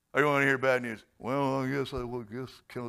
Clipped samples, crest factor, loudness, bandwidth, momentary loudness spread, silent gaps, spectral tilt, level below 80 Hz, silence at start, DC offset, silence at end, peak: under 0.1%; 20 dB; -29 LUFS; 14.5 kHz; 16 LU; none; -6 dB/octave; -56 dBFS; 0.15 s; under 0.1%; 0 s; -10 dBFS